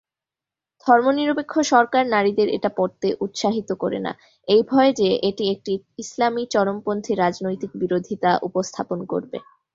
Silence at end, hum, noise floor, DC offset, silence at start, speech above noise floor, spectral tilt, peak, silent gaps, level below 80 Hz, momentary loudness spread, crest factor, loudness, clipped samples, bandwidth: 0.35 s; none; -89 dBFS; under 0.1%; 0.85 s; 68 dB; -5 dB/octave; -2 dBFS; none; -62 dBFS; 11 LU; 20 dB; -21 LUFS; under 0.1%; 7.8 kHz